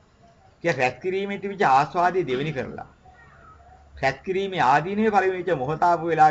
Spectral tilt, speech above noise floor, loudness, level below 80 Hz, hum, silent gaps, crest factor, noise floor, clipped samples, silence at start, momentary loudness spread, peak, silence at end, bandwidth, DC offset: -6 dB/octave; 33 dB; -23 LUFS; -54 dBFS; none; none; 18 dB; -55 dBFS; under 0.1%; 0.65 s; 9 LU; -6 dBFS; 0 s; 8 kHz; under 0.1%